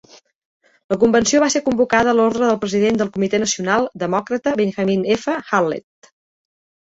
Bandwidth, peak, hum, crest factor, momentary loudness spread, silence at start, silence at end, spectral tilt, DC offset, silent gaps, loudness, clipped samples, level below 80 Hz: 8 kHz; -2 dBFS; none; 16 dB; 6 LU; 0.9 s; 1.15 s; -4 dB/octave; under 0.1%; none; -18 LUFS; under 0.1%; -54 dBFS